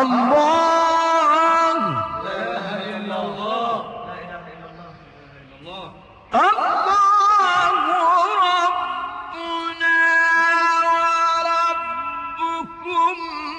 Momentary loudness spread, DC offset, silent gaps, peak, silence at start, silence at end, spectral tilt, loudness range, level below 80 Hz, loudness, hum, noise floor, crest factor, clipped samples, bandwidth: 15 LU; under 0.1%; none; -8 dBFS; 0 s; 0 s; -3.5 dB/octave; 11 LU; -58 dBFS; -18 LUFS; none; -44 dBFS; 12 dB; under 0.1%; 10 kHz